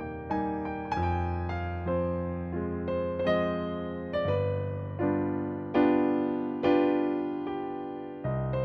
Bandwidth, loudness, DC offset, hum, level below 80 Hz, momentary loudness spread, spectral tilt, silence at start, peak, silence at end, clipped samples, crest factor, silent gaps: 6.6 kHz; -30 LUFS; under 0.1%; none; -48 dBFS; 9 LU; -9.5 dB/octave; 0 s; -14 dBFS; 0 s; under 0.1%; 16 dB; none